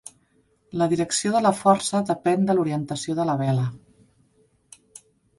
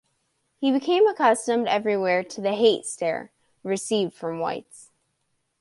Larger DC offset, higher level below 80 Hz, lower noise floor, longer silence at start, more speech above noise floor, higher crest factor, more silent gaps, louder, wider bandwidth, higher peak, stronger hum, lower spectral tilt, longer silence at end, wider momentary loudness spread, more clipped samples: neither; first, -62 dBFS vs -74 dBFS; second, -64 dBFS vs -74 dBFS; first, 0.75 s vs 0.6 s; second, 42 dB vs 51 dB; about the same, 20 dB vs 18 dB; neither; about the same, -23 LUFS vs -23 LUFS; about the same, 11.5 kHz vs 11.5 kHz; about the same, -4 dBFS vs -6 dBFS; neither; first, -5.5 dB/octave vs -4 dB/octave; first, 1.6 s vs 0.8 s; about the same, 8 LU vs 10 LU; neither